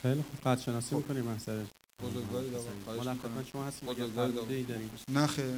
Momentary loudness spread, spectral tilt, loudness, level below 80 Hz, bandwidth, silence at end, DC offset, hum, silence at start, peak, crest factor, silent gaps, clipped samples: 9 LU; -5.5 dB/octave; -36 LUFS; -62 dBFS; 16 kHz; 0 s; under 0.1%; none; 0 s; -14 dBFS; 20 dB; none; under 0.1%